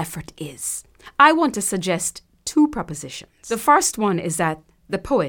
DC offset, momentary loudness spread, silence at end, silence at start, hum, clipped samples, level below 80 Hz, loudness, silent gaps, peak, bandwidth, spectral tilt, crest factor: under 0.1%; 17 LU; 0 s; 0 s; none; under 0.1%; -50 dBFS; -20 LUFS; none; 0 dBFS; 19 kHz; -3.5 dB/octave; 20 dB